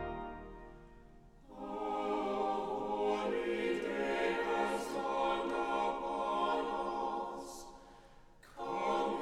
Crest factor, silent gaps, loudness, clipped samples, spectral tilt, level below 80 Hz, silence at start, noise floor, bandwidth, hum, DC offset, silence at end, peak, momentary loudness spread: 16 dB; none; -36 LUFS; under 0.1%; -4.5 dB/octave; -60 dBFS; 0 s; -58 dBFS; 15.5 kHz; none; under 0.1%; 0 s; -22 dBFS; 16 LU